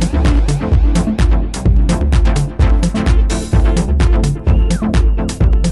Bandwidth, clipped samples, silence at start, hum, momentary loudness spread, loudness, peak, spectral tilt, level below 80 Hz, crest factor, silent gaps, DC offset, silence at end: 11.5 kHz; under 0.1%; 0 s; none; 2 LU; -14 LUFS; 0 dBFS; -6.5 dB/octave; -12 dBFS; 12 dB; none; under 0.1%; 0 s